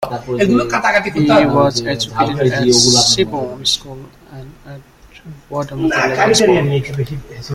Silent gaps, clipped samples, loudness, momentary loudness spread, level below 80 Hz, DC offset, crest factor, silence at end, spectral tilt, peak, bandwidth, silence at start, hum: none; under 0.1%; -14 LUFS; 14 LU; -42 dBFS; under 0.1%; 16 dB; 0 s; -3.5 dB/octave; 0 dBFS; 16 kHz; 0 s; none